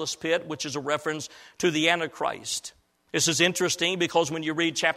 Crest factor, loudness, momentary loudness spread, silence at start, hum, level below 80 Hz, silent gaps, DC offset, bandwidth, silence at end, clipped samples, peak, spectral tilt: 20 dB; -26 LUFS; 10 LU; 0 s; none; -66 dBFS; none; under 0.1%; 15.5 kHz; 0 s; under 0.1%; -6 dBFS; -2.5 dB/octave